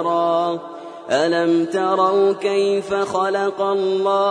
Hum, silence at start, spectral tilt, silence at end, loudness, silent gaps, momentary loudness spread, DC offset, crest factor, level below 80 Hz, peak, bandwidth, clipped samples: none; 0 s; -5 dB/octave; 0 s; -19 LUFS; none; 6 LU; under 0.1%; 14 dB; -66 dBFS; -4 dBFS; 10 kHz; under 0.1%